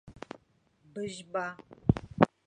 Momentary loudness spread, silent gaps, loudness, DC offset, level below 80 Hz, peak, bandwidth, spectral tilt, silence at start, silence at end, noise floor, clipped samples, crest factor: 19 LU; none; -33 LUFS; under 0.1%; -52 dBFS; -4 dBFS; 10 kHz; -7 dB/octave; 0.05 s; 0.2 s; -68 dBFS; under 0.1%; 30 dB